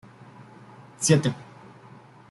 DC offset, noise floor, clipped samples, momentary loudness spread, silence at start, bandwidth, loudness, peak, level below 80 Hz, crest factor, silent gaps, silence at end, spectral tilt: under 0.1%; -49 dBFS; under 0.1%; 27 LU; 1 s; 12 kHz; -23 LUFS; -6 dBFS; -62 dBFS; 22 dB; none; 0.85 s; -5 dB/octave